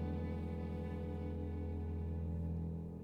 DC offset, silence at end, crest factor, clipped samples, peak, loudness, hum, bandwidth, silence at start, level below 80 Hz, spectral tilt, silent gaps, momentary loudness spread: under 0.1%; 0 s; 12 dB; under 0.1%; -30 dBFS; -43 LUFS; none; 4.5 kHz; 0 s; -48 dBFS; -10 dB/octave; none; 2 LU